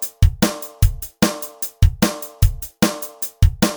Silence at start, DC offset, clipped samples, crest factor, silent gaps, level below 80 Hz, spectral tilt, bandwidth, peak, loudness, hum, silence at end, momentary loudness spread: 0 s; under 0.1%; under 0.1%; 18 dB; none; -22 dBFS; -5 dB/octave; over 20 kHz; 0 dBFS; -20 LUFS; none; 0 s; 7 LU